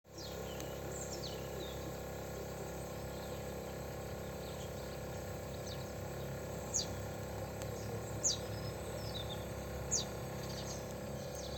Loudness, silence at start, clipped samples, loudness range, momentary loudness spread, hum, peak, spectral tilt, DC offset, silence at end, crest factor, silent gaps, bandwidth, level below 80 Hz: -42 LUFS; 0.05 s; under 0.1%; 5 LU; 8 LU; none; -22 dBFS; -3.5 dB/octave; under 0.1%; 0 s; 20 dB; none; 17 kHz; -54 dBFS